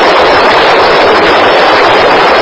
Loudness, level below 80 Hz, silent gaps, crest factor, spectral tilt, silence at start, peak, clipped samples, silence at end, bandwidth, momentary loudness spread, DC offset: -5 LUFS; -34 dBFS; none; 6 dB; -4 dB/octave; 0 s; 0 dBFS; 7%; 0 s; 8 kHz; 0 LU; under 0.1%